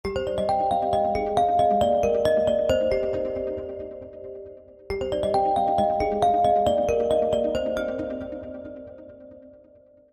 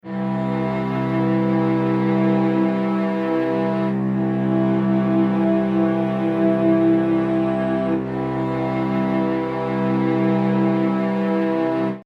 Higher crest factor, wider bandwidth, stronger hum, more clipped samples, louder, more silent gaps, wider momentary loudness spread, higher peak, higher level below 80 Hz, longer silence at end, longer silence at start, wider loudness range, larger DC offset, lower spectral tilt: about the same, 16 dB vs 12 dB; first, 15 kHz vs 5.6 kHz; neither; neither; second, -23 LUFS vs -20 LUFS; neither; first, 19 LU vs 4 LU; about the same, -8 dBFS vs -6 dBFS; first, -46 dBFS vs -52 dBFS; first, 0.65 s vs 0.05 s; about the same, 0.05 s vs 0.05 s; about the same, 4 LU vs 2 LU; neither; second, -6 dB/octave vs -9.5 dB/octave